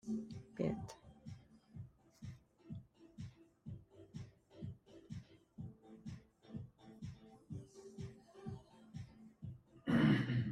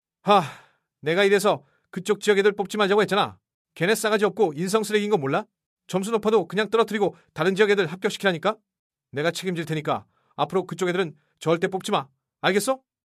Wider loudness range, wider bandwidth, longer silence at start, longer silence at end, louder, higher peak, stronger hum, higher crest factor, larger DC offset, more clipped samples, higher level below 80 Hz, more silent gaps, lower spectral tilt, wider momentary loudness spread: first, 13 LU vs 4 LU; second, 11 kHz vs 15.5 kHz; second, 0.05 s vs 0.25 s; second, 0 s vs 0.3 s; second, -44 LUFS vs -23 LUFS; second, -22 dBFS vs -4 dBFS; neither; about the same, 22 dB vs 20 dB; neither; neither; about the same, -68 dBFS vs -70 dBFS; second, none vs 3.54-3.65 s, 5.66-5.77 s, 8.79-8.90 s; first, -7.5 dB/octave vs -4.5 dB/octave; first, 20 LU vs 9 LU